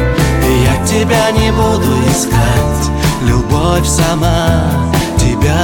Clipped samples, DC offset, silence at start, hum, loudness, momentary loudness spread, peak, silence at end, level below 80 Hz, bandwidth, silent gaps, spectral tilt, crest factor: under 0.1%; under 0.1%; 0 s; none; -12 LUFS; 3 LU; 0 dBFS; 0 s; -18 dBFS; 17.5 kHz; none; -5 dB/octave; 10 dB